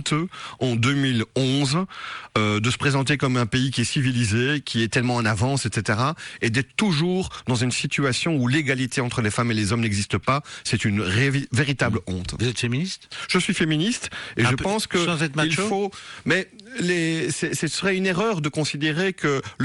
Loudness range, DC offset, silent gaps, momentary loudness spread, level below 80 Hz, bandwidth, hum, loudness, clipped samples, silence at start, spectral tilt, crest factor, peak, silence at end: 2 LU; under 0.1%; none; 5 LU; -50 dBFS; 12 kHz; none; -23 LUFS; under 0.1%; 0 s; -5 dB/octave; 14 dB; -8 dBFS; 0 s